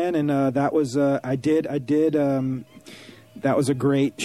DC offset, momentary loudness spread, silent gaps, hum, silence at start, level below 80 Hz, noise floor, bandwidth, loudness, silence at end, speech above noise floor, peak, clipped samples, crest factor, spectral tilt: under 0.1%; 10 LU; none; none; 0 s; -62 dBFS; -45 dBFS; 13.5 kHz; -22 LUFS; 0 s; 23 dB; -8 dBFS; under 0.1%; 14 dB; -7 dB/octave